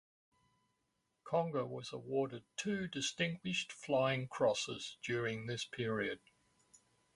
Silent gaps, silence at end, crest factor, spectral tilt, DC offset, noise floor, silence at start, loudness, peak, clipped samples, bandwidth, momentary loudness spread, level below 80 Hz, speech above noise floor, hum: none; 1 s; 20 dB; -4.5 dB/octave; under 0.1%; -83 dBFS; 1.25 s; -38 LUFS; -20 dBFS; under 0.1%; 11.5 kHz; 8 LU; -74 dBFS; 45 dB; none